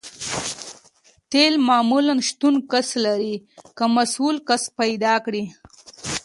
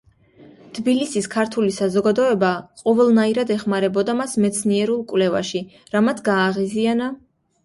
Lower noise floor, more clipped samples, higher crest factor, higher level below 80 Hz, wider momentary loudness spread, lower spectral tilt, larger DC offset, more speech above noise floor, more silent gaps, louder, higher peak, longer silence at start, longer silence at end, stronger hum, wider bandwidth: first, -56 dBFS vs -49 dBFS; neither; about the same, 18 dB vs 14 dB; about the same, -60 dBFS vs -60 dBFS; first, 12 LU vs 7 LU; second, -3 dB/octave vs -5 dB/octave; neither; first, 37 dB vs 29 dB; neither; about the same, -20 LUFS vs -20 LUFS; first, -2 dBFS vs -6 dBFS; second, 0.05 s vs 0.4 s; second, 0.05 s vs 0.5 s; neither; about the same, 11.5 kHz vs 11.5 kHz